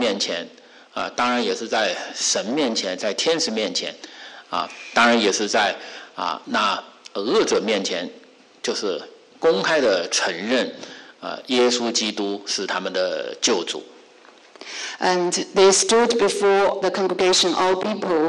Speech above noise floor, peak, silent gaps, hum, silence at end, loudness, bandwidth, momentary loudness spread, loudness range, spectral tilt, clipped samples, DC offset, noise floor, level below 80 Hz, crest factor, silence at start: 28 dB; -6 dBFS; none; none; 0 s; -21 LUFS; 11.5 kHz; 15 LU; 5 LU; -2 dB/octave; under 0.1%; under 0.1%; -49 dBFS; -64 dBFS; 14 dB; 0 s